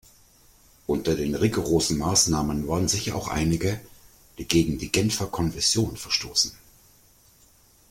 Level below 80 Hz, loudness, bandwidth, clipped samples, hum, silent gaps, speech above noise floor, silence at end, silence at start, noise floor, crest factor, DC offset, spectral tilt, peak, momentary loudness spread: -44 dBFS; -24 LUFS; 16.5 kHz; under 0.1%; none; none; 33 dB; 1.35 s; 0.9 s; -57 dBFS; 26 dB; under 0.1%; -4 dB/octave; 0 dBFS; 7 LU